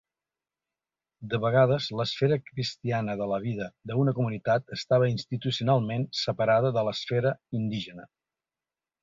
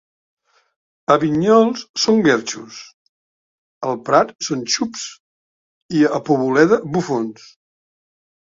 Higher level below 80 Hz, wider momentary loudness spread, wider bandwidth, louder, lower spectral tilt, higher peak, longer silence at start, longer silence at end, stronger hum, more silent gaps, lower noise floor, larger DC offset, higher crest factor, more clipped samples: about the same, -62 dBFS vs -60 dBFS; second, 9 LU vs 15 LU; about the same, 7.6 kHz vs 7.8 kHz; second, -27 LUFS vs -17 LUFS; first, -6.5 dB/octave vs -4.5 dB/octave; second, -10 dBFS vs 0 dBFS; about the same, 1.2 s vs 1.1 s; second, 0.95 s vs 1.1 s; neither; second, none vs 1.89-1.94 s, 2.94-3.81 s, 5.20-5.89 s; about the same, under -90 dBFS vs under -90 dBFS; neither; about the same, 18 dB vs 20 dB; neither